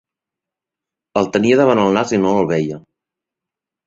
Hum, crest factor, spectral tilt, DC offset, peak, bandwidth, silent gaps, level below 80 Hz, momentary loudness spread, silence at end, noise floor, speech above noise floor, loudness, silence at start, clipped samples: none; 16 dB; -6 dB/octave; under 0.1%; -2 dBFS; 7.8 kHz; none; -54 dBFS; 11 LU; 1.1 s; -86 dBFS; 71 dB; -16 LUFS; 1.15 s; under 0.1%